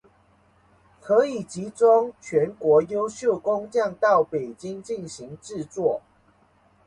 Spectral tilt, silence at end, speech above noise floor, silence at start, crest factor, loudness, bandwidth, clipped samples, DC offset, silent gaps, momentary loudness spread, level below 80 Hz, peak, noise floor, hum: -5.5 dB/octave; 0.85 s; 37 dB; 1.05 s; 18 dB; -23 LUFS; 10.5 kHz; under 0.1%; under 0.1%; none; 15 LU; -64 dBFS; -6 dBFS; -60 dBFS; none